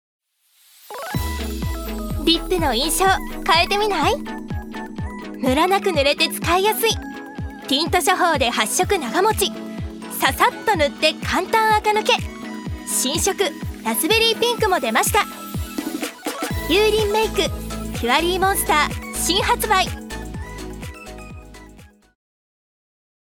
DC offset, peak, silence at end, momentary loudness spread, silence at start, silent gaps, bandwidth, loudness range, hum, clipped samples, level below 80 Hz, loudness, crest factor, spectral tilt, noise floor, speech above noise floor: under 0.1%; 0 dBFS; 1.45 s; 14 LU; 0.85 s; none; over 20 kHz; 3 LU; none; under 0.1%; -36 dBFS; -19 LUFS; 20 dB; -3 dB/octave; -58 dBFS; 40 dB